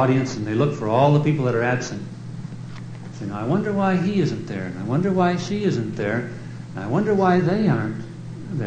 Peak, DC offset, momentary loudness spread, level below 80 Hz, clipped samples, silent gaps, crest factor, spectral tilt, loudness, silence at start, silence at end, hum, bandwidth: -4 dBFS; under 0.1%; 16 LU; -54 dBFS; under 0.1%; none; 18 dB; -7.5 dB/octave; -22 LUFS; 0 s; 0 s; none; 9 kHz